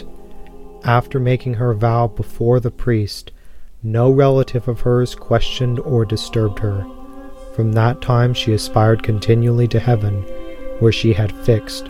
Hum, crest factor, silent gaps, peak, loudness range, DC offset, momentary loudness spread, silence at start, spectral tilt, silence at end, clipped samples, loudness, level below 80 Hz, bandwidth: none; 16 dB; none; 0 dBFS; 3 LU; under 0.1%; 12 LU; 0 s; -7 dB/octave; 0 s; under 0.1%; -17 LUFS; -32 dBFS; 12.5 kHz